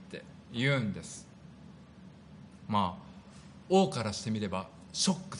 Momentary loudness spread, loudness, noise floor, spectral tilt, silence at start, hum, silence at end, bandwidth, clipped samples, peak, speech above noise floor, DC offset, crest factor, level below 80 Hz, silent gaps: 24 LU; -32 LUFS; -53 dBFS; -4.5 dB/octave; 0 s; none; 0 s; 10.5 kHz; under 0.1%; -14 dBFS; 22 dB; under 0.1%; 20 dB; -64 dBFS; none